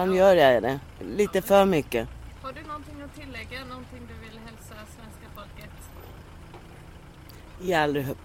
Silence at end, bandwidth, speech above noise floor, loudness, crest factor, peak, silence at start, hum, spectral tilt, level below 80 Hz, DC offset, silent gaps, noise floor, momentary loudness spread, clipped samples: 0.1 s; 16.5 kHz; 21 dB; -23 LUFS; 20 dB; -6 dBFS; 0 s; none; -5.5 dB/octave; -48 dBFS; under 0.1%; none; -46 dBFS; 26 LU; under 0.1%